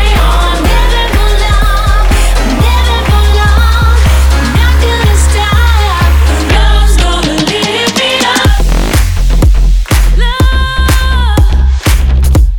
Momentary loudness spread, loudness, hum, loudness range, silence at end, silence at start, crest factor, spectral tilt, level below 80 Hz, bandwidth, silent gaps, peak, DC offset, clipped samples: 2 LU; -9 LUFS; none; 1 LU; 0 s; 0 s; 6 dB; -4.5 dB/octave; -8 dBFS; 18.5 kHz; none; 0 dBFS; under 0.1%; 0.2%